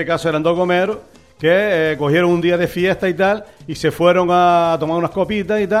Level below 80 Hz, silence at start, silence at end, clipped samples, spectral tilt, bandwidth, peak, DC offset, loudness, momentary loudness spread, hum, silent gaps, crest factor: -48 dBFS; 0 s; 0 s; under 0.1%; -6.5 dB/octave; 15 kHz; -2 dBFS; 0.2%; -16 LUFS; 8 LU; none; none; 14 dB